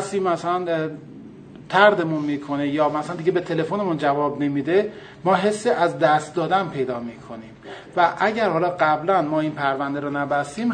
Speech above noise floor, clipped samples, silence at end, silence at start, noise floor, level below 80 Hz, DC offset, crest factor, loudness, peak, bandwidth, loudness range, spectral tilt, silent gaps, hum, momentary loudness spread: 20 dB; under 0.1%; 0 s; 0 s; -41 dBFS; -62 dBFS; under 0.1%; 20 dB; -21 LUFS; -2 dBFS; 9.4 kHz; 1 LU; -6 dB/octave; none; none; 12 LU